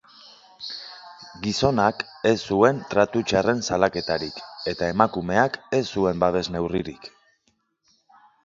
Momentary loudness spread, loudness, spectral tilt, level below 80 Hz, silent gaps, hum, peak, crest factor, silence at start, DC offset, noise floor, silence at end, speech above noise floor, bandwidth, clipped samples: 16 LU; -23 LUFS; -5 dB/octave; -50 dBFS; none; none; 0 dBFS; 24 dB; 0.6 s; under 0.1%; -69 dBFS; 1.35 s; 47 dB; 7.8 kHz; under 0.1%